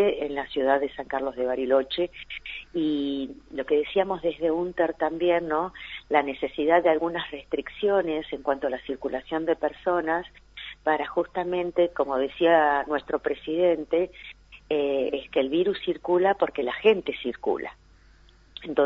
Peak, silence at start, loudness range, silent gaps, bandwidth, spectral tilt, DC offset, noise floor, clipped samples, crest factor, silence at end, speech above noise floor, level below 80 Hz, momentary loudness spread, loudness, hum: -6 dBFS; 0 s; 3 LU; none; 6.4 kHz; -7 dB/octave; under 0.1%; -55 dBFS; under 0.1%; 18 dB; 0 s; 29 dB; -56 dBFS; 10 LU; -26 LUFS; none